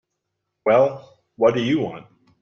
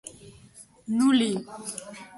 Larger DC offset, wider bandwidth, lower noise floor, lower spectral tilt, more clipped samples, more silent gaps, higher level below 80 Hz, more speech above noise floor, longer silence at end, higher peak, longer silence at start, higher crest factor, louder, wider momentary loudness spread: neither; second, 6.8 kHz vs 11.5 kHz; first, -78 dBFS vs -52 dBFS; first, -7 dB/octave vs -4 dB/octave; neither; neither; about the same, -62 dBFS vs -66 dBFS; first, 59 dB vs 27 dB; first, 0.4 s vs 0.1 s; first, -4 dBFS vs -12 dBFS; first, 0.65 s vs 0.05 s; about the same, 18 dB vs 16 dB; first, -20 LUFS vs -25 LUFS; second, 17 LU vs 21 LU